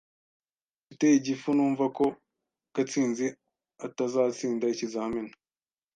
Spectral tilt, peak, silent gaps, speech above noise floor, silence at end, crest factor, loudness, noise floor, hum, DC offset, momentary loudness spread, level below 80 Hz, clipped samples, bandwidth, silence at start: -5 dB/octave; -12 dBFS; none; over 63 dB; 0.65 s; 18 dB; -28 LUFS; under -90 dBFS; none; under 0.1%; 12 LU; -70 dBFS; under 0.1%; 9.2 kHz; 0.9 s